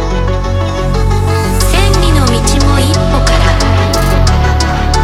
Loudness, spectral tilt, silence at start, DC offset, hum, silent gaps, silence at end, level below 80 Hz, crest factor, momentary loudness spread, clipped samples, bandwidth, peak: -11 LUFS; -5 dB/octave; 0 s; 0.2%; none; none; 0 s; -14 dBFS; 10 dB; 5 LU; under 0.1%; 15.5 kHz; 0 dBFS